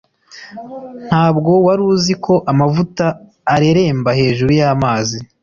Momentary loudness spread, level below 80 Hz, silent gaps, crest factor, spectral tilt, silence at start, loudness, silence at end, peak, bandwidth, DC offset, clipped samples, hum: 18 LU; -44 dBFS; none; 12 dB; -6.5 dB/octave; 0.35 s; -14 LUFS; 0.2 s; -2 dBFS; 7.4 kHz; under 0.1%; under 0.1%; none